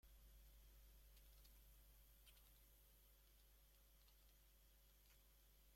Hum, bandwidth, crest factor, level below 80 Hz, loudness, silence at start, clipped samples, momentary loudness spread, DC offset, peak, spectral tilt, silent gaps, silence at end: 50 Hz at -70 dBFS; 16.5 kHz; 16 dB; -72 dBFS; -70 LUFS; 0.05 s; under 0.1%; 1 LU; under 0.1%; -54 dBFS; -3 dB/octave; none; 0 s